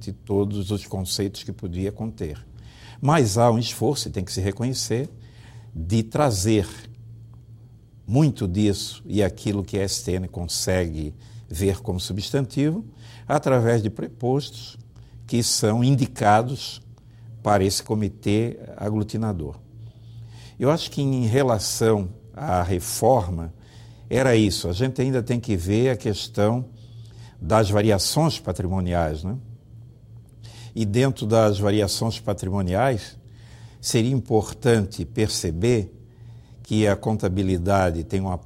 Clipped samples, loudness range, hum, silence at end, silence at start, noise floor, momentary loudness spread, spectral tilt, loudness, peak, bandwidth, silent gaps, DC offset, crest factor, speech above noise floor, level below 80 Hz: under 0.1%; 3 LU; none; 0.05 s; 0 s; -47 dBFS; 16 LU; -5.5 dB/octave; -23 LUFS; -4 dBFS; 16 kHz; none; under 0.1%; 20 dB; 25 dB; -44 dBFS